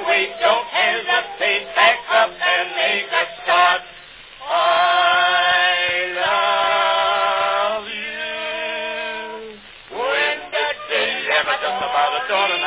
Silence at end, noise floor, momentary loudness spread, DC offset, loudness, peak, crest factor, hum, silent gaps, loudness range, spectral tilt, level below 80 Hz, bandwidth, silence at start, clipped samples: 0 s; -41 dBFS; 10 LU; under 0.1%; -18 LUFS; -2 dBFS; 18 dB; none; none; 6 LU; -4.5 dB/octave; -60 dBFS; 4 kHz; 0 s; under 0.1%